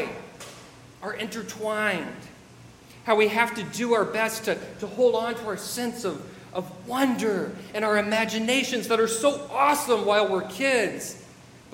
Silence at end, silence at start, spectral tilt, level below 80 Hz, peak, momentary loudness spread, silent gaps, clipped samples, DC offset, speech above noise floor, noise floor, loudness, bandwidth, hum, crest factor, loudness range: 0 s; 0 s; -3.5 dB/octave; -64 dBFS; -6 dBFS; 15 LU; none; under 0.1%; under 0.1%; 24 dB; -49 dBFS; -25 LUFS; 16.5 kHz; none; 20 dB; 4 LU